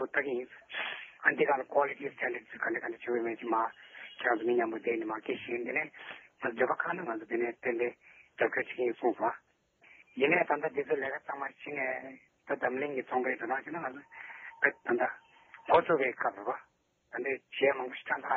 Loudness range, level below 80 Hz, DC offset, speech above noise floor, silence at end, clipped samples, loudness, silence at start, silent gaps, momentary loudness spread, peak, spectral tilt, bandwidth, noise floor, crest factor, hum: 3 LU; -78 dBFS; under 0.1%; 31 dB; 0 s; under 0.1%; -33 LUFS; 0 s; none; 13 LU; -10 dBFS; -2.5 dB/octave; 4.3 kHz; -63 dBFS; 22 dB; none